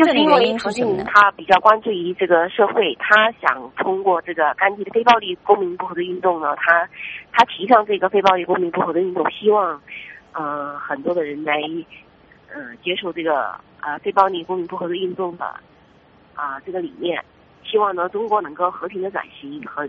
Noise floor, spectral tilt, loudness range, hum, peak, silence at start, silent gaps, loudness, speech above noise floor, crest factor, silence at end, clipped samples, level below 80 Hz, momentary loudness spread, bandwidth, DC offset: -51 dBFS; -1.5 dB/octave; 9 LU; none; 0 dBFS; 0 s; none; -19 LUFS; 32 dB; 20 dB; 0 s; under 0.1%; -60 dBFS; 15 LU; 8 kHz; under 0.1%